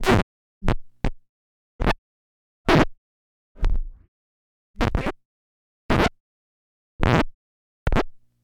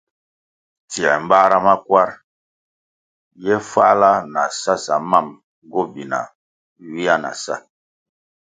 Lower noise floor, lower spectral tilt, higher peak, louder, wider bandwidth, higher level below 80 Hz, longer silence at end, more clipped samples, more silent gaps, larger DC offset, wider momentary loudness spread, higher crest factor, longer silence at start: about the same, under -90 dBFS vs under -90 dBFS; first, -6.5 dB/octave vs -4 dB/octave; about the same, -2 dBFS vs 0 dBFS; second, -25 LUFS vs -17 LUFS; first, 15 kHz vs 9.4 kHz; first, -30 dBFS vs -62 dBFS; second, 0.25 s vs 0.85 s; neither; first, 0.23-0.61 s, 1.29-1.79 s, 1.98-2.65 s, 2.98-3.55 s, 4.08-4.74 s, 5.25-5.89 s, 6.20-6.99 s, 7.34-7.86 s vs 2.24-3.31 s, 5.44-5.62 s, 6.35-6.76 s; neither; second, 12 LU vs 15 LU; about the same, 22 dB vs 20 dB; second, 0 s vs 0.9 s